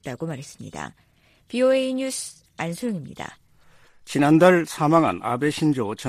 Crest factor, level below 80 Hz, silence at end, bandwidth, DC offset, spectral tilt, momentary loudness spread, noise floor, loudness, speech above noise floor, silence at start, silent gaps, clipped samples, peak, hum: 20 dB; -60 dBFS; 0 s; 14.5 kHz; under 0.1%; -5.5 dB/octave; 20 LU; -54 dBFS; -22 LUFS; 32 dB; 0.05 s; none; under 0.1%; -2 dBFS; none